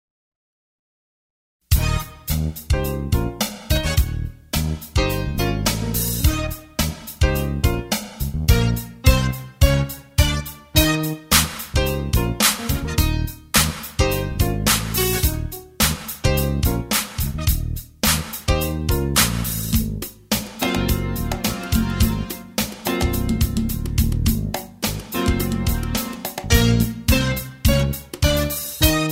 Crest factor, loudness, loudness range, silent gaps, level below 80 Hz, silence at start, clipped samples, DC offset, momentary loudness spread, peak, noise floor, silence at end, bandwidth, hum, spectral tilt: 20 dB; -21 LUFS; 3 LU; none; -26 dBFS; 1.7 s; under 0.1%; under 0.1%; 8 LU; 0 dBFS; under -90 dBFS; 0 s; 16.5 kHz; none; -4 dB/octave